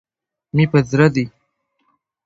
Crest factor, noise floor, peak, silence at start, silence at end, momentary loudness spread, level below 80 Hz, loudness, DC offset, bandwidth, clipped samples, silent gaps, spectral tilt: 20 dB; -69 dBFS; 0 dBFS; 0.55 s; 1 s; 9 LU; -50 dBFS; -16 LUFS; under 0.1%; 7.8 kHz; under 0.1%; none; -7.5 dB/octave